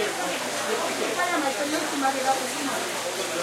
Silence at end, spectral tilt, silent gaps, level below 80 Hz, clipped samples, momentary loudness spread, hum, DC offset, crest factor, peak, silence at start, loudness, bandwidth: 0 s; -1.5 dB/octave; none; -78 dBFS; under 0.1%; 3 LU; none; under 0.1%; 14 dB; -12 dBFS; 0 s; -26 LUFS; 16 kHz